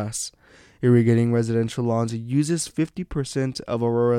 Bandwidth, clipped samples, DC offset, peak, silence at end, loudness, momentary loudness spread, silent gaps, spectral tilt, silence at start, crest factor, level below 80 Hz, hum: 14.5 kHz; under 0.1%; under 0.1%; -8 dBFS; 0 s; -23 LUFS; 10 LU; none; -6.5 dB/octave; 0 s; 16 dB; -52 dBFS; none